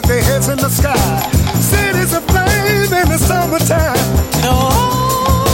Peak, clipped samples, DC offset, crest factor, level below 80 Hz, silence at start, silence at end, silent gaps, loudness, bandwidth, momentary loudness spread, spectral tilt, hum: 0 dBFS; under 0.1%; under 0.1%; 12 dB; -22 dBFS; 0 s; 0 s; none; -13 LUFS; 17 kHz; 2 LU; -4.5 dB/octave; none